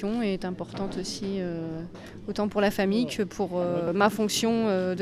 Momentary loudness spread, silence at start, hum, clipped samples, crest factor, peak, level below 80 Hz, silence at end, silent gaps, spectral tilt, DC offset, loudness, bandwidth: 11 LU; 0 s; none; under 0.1%; 18 dB; -10 dBFS; -52 dBFS; 0 s; none; -5 dB/octave; under 0.1%; -27 LUFS; 15.5 kHz